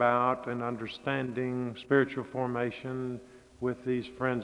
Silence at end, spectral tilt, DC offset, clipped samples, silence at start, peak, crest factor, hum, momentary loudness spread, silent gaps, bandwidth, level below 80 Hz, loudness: 0 s; -7.5 dB/octave; under 0.1%; under 0.1%; 0 s; -12 dBFS; 20 dB; none; 9 LU; none; 10.5 kHz; -66 dBFS; -32 LUFS